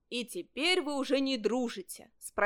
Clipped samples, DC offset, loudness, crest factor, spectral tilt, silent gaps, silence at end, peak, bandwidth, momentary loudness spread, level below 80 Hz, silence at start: under 0.1%; under 0.1%; -32 LUFS; 18 dB; -2.5 dB/octave; none; 0 s; -14 dBFS; 18 kHz; 14 LU; -70 dBFS; 0.1 s